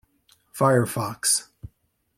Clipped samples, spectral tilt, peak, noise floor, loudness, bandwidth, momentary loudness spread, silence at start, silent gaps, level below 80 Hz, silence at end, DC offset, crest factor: under 0.1%; -4 dB/octave; -6 dBFS; -64 dBFS; -22 LUFS; 16.5 kHz; 7 LU; 0.55 s; none; -58 dBFS; 0.5 s; under 0.1%; 20 dB